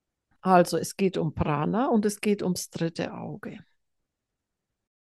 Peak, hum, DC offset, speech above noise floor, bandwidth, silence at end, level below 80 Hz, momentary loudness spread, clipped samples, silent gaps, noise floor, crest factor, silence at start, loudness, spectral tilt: -6 dBFS; none; under 0.1%; 59 dB; 12.5 kHz; 1.45 s; -54 dBFS; 15 LU; under 0.1%; none; -84 dBFS; 22 dB; 0.45 s; -26 LUFS; -6 dB/octave